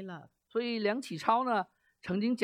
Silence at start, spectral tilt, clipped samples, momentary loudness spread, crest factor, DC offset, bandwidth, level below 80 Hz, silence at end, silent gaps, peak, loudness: 0 s; -5.5 dB/octave; under 0.1%; 16 LU; 20 dB; under 0.1%; 15 kHz; -74 dBFS; 0 s; none; -14 dBFS; -32 LUFS